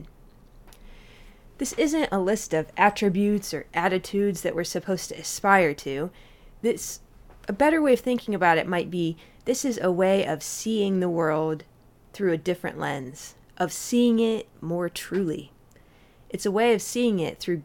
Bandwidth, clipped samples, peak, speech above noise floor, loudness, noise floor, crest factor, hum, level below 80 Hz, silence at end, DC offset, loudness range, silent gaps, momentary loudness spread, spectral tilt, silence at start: 18 kHz; under 0.1%; -4 dBFS; 30 dB; -25 LUFS; -55 dBFS; 22 dB; none; -54 dBFS; 0 s; under 0.1%; 3 LU; none; 11 LU; -4.5 dB/octave; 0 s